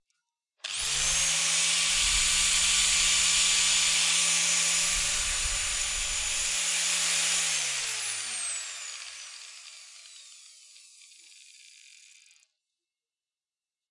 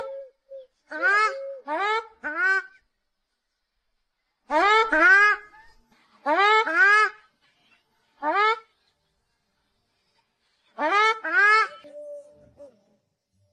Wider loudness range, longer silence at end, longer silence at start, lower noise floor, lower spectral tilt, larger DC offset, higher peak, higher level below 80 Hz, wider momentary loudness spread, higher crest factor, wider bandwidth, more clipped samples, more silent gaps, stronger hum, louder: first, 15 LU vs 10 LU; first, 3.5 s vs 0.85 s; first, 0.65 s vs 0 s; first, under -90 dBFS vs -79 dBFS; second, 2 dB/octave vs -0.5 dB/octave; neither; second, -12 dBFS vs -8 dBFS; first, -48 dBFS vs -64 dBFS; second, 16 LU vs 19 LU; about the same, 18 dB vs 18 dB; first, 12 kHz vs 10 kHz; neither; neither; neither; second, -24 LUFS vs -20 LUFS